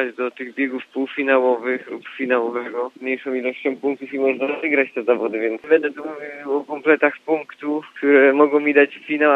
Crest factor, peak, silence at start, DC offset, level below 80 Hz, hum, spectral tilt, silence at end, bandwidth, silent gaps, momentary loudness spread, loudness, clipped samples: 20 dB; 0 dBFS; 0 s; under 0.1%; -80 dBFS; none; -6.5 dB/octave; 0 s; 5 kHz; none; 11 LU; -20 LUFS; under 0.1%